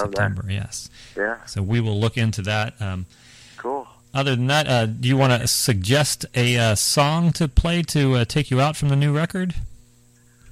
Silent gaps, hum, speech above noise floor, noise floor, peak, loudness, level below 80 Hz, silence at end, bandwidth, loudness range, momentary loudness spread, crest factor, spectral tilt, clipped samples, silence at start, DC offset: none; none; 34 dB; -54 dBFS; -4 dBFS; -21 LUFS; -36 dBFS; 0 s; 15.5 kHz; 6 LU; 12 LU; 18 dB; -4.5 dB/octave; under 0.1%; 0 s; under 0.1%